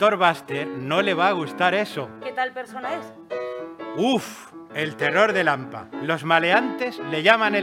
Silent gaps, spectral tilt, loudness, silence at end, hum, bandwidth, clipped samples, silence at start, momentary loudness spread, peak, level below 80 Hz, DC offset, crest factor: none; -5 dB/octave; -22 LUFS; 0 s; none; 16 kHz; under 0.1%; 0 s; 15 LU; 0 dBFS; -72 dBFS; under 0.1%; 22 dB